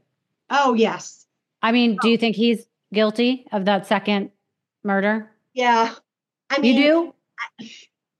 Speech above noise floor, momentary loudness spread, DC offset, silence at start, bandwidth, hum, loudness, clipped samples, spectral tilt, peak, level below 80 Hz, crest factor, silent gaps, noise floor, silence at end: 47 dB; 16 LU; under 0.1%; 0.5 s; 12 kHz; none; -20 LUFS; under 0.1%; -5 dB/octave; -4 dBFS; -86 dBFS; 18 dB; none; -67 dBFS; 0.45 s